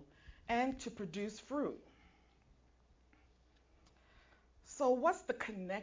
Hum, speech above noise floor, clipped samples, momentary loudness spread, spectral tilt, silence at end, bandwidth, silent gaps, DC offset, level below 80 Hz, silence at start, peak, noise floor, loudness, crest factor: none; 31 dB; under 0.1%; 14 LU; -5 dB/octave; 0 s; 7.8 kHz; none; under 0.1%; -66 dBFS; 0 s; -20 dBFS; -69 dBFS; -38 LUFS; 22 dB